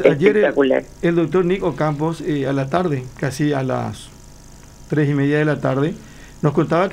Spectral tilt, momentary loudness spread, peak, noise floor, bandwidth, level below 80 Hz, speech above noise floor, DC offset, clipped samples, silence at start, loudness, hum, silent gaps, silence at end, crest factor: -7.5 dB/octave; 8 LU; 0 dBFS; -41 dBFS; 15 kHz; -46 dBFS; 23 dB; under 0.1%; under 0.1%; 0 s; -19 LUFS; none; none; 0 s; 18 dB